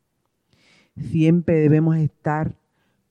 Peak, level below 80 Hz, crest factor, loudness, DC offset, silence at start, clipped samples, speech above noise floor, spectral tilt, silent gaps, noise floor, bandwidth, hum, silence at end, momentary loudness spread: -4 dBFS; -52 dBFS; 16 dB; -20 LUFS; under 0.1%; 0.95 s; under 0.1%; 54 dB; -10 dB/octave; none; -72 dBFS; 6.6 kHz; none; 0.6 s; 11 LU